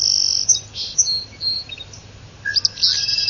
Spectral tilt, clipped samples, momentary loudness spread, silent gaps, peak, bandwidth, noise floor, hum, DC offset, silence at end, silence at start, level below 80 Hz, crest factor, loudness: 1.5 dB/octave; under 0.1%; 15 LU; none; -2 dBFS; 7.4 kHz; -40 dBFS; none; under 0.1%; 0 s; 0 s; -50 dBFS; 20 dB; -17 LUFS